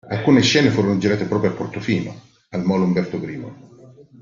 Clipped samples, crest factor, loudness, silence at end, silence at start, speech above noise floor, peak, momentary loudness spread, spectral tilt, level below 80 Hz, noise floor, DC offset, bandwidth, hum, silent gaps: under 0.1%; 18 dB; -19 LUFS; 0.2 s; 0.05 s; 27 dB; -2 dBFS; 16 LU; -5.5 dB/octave; -54 dBFS; -45 dBFS; under 0.1%; 7.6 kHz; none; none